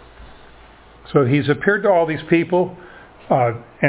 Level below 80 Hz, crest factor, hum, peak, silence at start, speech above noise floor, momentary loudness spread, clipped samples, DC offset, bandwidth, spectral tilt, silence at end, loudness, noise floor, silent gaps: -50 dBFS; 18 dB; none; 0 dBFS; 0.2 s; 28 dB; 5 LU; under 0.1%; under 0.1%; 4 kHz; -11 dB/octave; 0 s; -18 LUFS; -45 dBFS; none